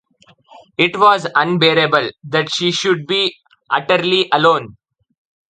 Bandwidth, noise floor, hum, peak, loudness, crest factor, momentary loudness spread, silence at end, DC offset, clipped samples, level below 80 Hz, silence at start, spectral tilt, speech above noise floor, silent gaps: 9.2 kHz; -51 dBFS; none; 0 dBFS; -15 LUFS; 16 dB; 8 LU; 0.8 s; under 0.1%; under 0.1%; -60 dBFS; 0.8 s; -4 dB/octave; 36 dB; none